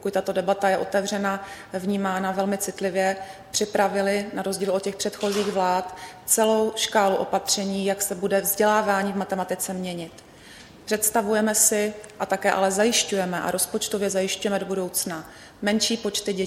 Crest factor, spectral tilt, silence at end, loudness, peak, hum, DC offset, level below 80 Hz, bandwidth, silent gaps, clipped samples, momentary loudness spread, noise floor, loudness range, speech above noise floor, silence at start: 20 dB; -3 dB/octave; 0 s; -24 LUFS; -6 dBFS; none; under 0.1%; -60 dBFS; 16.5 kHz; none; under 0.1%; 9 LU; -46 dBFS; 3 LU; 22 dB; 0 s